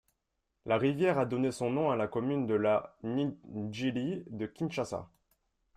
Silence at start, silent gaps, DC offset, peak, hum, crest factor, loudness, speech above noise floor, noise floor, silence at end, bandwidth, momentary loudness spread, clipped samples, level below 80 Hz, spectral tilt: 0.65 s; none; under 0.1%; -16 dBFS; none; 16 dB; -32 LUFS; 51 dB; -83 dBFS; 0.7 s; 13 kHz; 10 LU; under 0.1%; -68 dBFS; -7 dB/octave